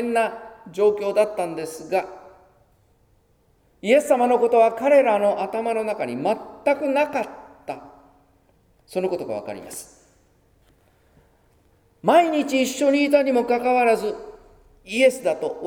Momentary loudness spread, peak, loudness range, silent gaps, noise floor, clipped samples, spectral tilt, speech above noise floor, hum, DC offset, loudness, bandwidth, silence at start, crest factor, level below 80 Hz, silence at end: 18 LU; -4 dBFS; 13 LU; none; -61 dBFS; under 0.1%; -4.5 dB/octave; 41 dB; none; under 0.1%; -21 LUFS; 18 kHz; 0 s; 18 dB; -62 dBFS; 0 s